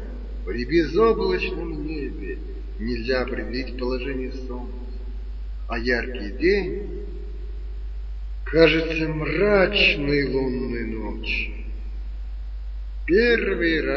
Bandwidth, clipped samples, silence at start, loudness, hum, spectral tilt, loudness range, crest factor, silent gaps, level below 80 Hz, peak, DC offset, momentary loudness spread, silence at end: 6.4 kHz; under 0.1%; 0 s; -23 LUFS; none; -7 dB/octave; 8 LU; 22 dB; none; -32 dBFS; -2 dBFS; under 0.1%; 18 LU; 0 s